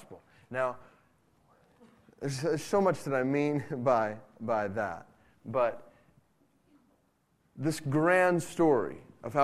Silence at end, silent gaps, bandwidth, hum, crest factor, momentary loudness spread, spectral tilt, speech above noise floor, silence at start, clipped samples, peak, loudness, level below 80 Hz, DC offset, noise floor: 0 s; none; 14.5 kHz; none; 20 dB; 14 LU; -6 dB/octave; 43 dB; 0 s; under 0.1%; -10 dBFS; -30 LUFS; -68 dBFS; under 0.1%; -72 dBFS